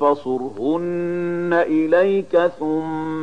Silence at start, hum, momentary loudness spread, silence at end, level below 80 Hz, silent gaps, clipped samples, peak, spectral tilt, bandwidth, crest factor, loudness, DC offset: 0 s; none; 7 LU; 0 s; -60 dBFS; none; under 0.1%; -4 dBFS; -8 dB/octave; 9.4 kHz; 14 dB; -20 LUFS; 0.7%